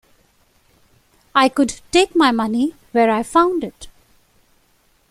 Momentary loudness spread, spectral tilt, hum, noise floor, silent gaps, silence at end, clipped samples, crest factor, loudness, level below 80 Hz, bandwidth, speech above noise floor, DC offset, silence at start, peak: 6 LU; -3.5 dB/octave; none; -59 dBFS; none; 1.2 s; under 0.1%; 18 dB; -17 LUFS; -52 dBFS; 15 kHz; 42 dB; under 0.1%; 1.35 s; 0 dBFS